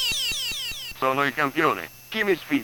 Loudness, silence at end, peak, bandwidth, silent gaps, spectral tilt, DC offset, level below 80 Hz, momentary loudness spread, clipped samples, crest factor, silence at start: -24 LUFS; 0 s; -8 dBFS; over 20 kHz; none; -2.5 dB/octave; under 0.1%; -52 dBFS; 8 LU; under 0.1%; 18 dB; 0 s